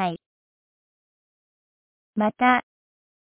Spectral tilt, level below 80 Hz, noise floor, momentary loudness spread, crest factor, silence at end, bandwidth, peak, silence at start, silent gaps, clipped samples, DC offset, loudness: -9 dB/octave; -68 dBFS; under -90 dBFS; 15 LU; 22 dB; 0.6 s; 4 kHz; -6 dBFS; 0 s; 0.26-2.13 s; under 0.1%; under 0.1%; -22 LUFS